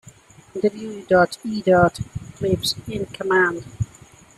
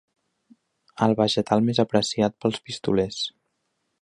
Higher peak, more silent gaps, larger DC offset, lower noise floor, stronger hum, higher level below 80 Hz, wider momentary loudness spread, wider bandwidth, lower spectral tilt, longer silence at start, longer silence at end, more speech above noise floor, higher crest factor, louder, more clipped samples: about the same, -4 dBFS vs -4 dBFS; neither; neither; second, -48 dBFS vs -75 dBFS; neither; first, -48 dBFS vs -56 dBFS; first, 15 LU vs 8 LU; first, 13.5 kHz vs 11 kHz; about the same, -5.5 dB/octave vs -5.5 dB/octave; second, 0.55 s vs 0.95 s; second, 0.5 s vs 0.75 s; second, 27 dB vs 53 dB; about the same, 18 dB vs 20 dB; about the same, -21 LUFS vs -23 LUFS; neither